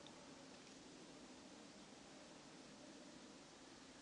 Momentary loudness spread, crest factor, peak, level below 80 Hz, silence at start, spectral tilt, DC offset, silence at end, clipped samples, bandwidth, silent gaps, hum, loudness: 1 LU; 18 dB; -44 dBFS; -84 dBFS; 0 s; -3 dB/octave; under 0.1%; 0 s; under 0.1%; 11 kHz; none; none; -60 LUFS